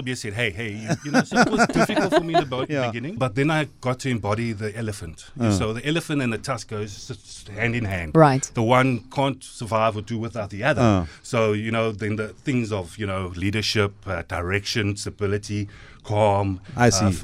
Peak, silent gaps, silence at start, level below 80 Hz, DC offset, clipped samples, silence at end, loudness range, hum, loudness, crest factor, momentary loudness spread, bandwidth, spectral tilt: -2 dBFS; none; 0 s; -46 dBFS; under 0.1%; under 0.1%; 0 s; 4 LU; none; -23 LUFS; 22 dB; 12 LU; 15 kHz; -5.5 dB/octave